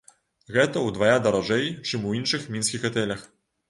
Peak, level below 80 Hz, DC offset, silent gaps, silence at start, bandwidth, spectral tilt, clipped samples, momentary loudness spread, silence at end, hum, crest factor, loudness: -6 dBFS; -58 dBFS; under 0.1%; none; 0.5 s; 11.5 kHz; -4 dB/octave; under 0.1%; 7 LU; 0.45 s; none; 20 dB; -24 LUFS